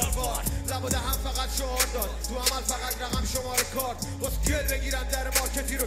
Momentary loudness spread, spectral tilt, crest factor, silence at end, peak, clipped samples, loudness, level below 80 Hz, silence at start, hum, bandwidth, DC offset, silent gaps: 5 LU; -3 dB/octave; 20 dB; 0 s; -10 dBFS; under 0.1%; -28 LUFS; -32 dBFS; 0 s; none; 16 kHz; under 0.1%; none